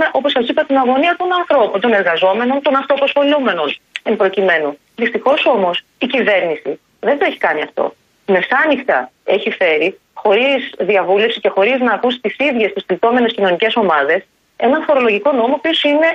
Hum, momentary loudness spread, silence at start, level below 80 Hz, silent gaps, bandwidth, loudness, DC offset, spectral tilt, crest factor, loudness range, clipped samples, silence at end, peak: none; 7 LU; 0 s; -62 dBFS; none; 7.8 kHz; -15 LUFS; under 0.1%; -5.5 dB/octave; 12 dB; 2 LU; under 0.1%; 0 s; -2 dBFS